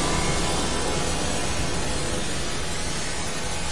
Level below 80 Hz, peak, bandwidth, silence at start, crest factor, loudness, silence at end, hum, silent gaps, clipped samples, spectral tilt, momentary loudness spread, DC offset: -34 dBFS; -12 dBFS; 11.5 kHz; 0 s; 14 dB; -26 LUFS; 0 s; none; none; under 0.1%; -3 dB/octave; 4 LU; 4%